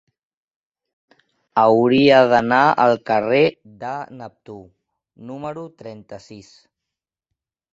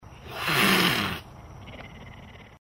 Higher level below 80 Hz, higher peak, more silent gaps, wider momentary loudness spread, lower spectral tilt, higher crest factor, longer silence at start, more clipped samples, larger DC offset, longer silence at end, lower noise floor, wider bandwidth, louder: second, -60 dBFS vs -52 dBFS; first, -2 dBFS vs -8 dBFS; neither; about the same, 25 LU vs 25 LU; first, -6.5 dB/octave vs -3.5 dB/octave; about the same, 18 dB vs 20 dB; first, 1.55 s vs 0.05 s; neither; neither; first, 1.3 s vs 0.1 s; first, -85 dBFS vs -46 dBFS; second, 7.8 kHz vs 16.5 kHz; first, -15 LUFS vs -23 LUFS